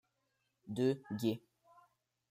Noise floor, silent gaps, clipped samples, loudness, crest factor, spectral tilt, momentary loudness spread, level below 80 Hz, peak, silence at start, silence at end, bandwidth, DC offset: -83 dBFS; none; under 0.1%; -38 LUFS; 18 dB; -7 dB/octave; 10 LU; -80 dBFS; -22 dBFS; 0.65 s; 0.9 s; 15.5 kHz; under 0.1%